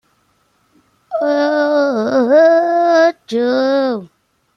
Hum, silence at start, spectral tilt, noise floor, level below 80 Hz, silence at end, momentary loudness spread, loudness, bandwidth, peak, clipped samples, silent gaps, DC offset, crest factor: none; 1.1 s; -5 dB/octave; -60 dBFS; -66 dBFS; 0.5 s; 10 LU; -14 LUFS; 6.8 kHz; -2 dBFS; under 0.1%; none; under 0.1%; 14 dB